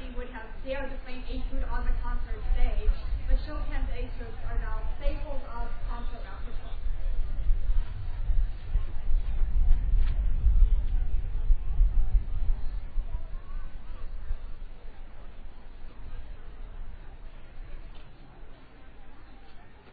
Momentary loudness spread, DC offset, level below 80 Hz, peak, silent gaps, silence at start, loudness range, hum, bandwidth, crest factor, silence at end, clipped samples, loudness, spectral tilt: 21 LU; under 0.1%; -28 dBFS; -8 dBFS; none; 0 s; 18 LU; none; 4.5 kHz; 18 dB; 0 s; under 0.1%; -34 LUFS; -9.5 dB/octave